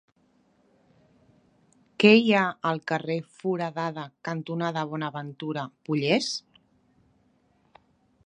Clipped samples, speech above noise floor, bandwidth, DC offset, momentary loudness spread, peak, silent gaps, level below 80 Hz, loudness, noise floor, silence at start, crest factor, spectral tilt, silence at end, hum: under 0.1%; 40 dB; 10.5 kHz; under 0.1%; 16 LU; -4 dBFS; none; -76 dBFS; -26 LUFS; -66 dBFS; 2 s; 24 dB; -5.5 dB/octave; 1.85 s; none